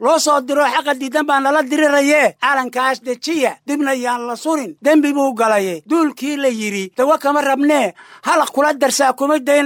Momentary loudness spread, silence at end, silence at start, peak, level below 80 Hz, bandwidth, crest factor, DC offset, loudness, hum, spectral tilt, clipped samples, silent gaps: 7 LU; 0 s; 0 s; -2 dBFS; -72 dBFS; 18 kHz; 12 dB; under 0.1%; -16 LUFS; none; -3 dB/octave; under 0.1%; none